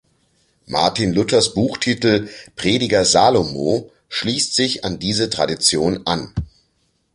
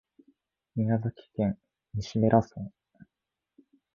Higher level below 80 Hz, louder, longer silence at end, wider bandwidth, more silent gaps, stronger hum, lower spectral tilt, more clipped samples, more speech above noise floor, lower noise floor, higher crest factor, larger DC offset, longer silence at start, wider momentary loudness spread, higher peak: first, -44 dBFS vs -56 dBFS; first, -18 LUFS vs -29 LUFS; second, 0.7 s vs 1.3 s; first, 11.5 kHz vs 7.2 kHz; neither; neither; second, -3.5 dB/octave vs -8.5 dB/octave; neither; second, 47 dB vs 60 dB; second, -65 dBFS vs -88 dBFS; second, 18 dB vs 24 dB; neither; about the same, 0.7 s vs 0.75 s; second, 10 LU vs 18 LU; first, -2 dBFS vs -6 dBFS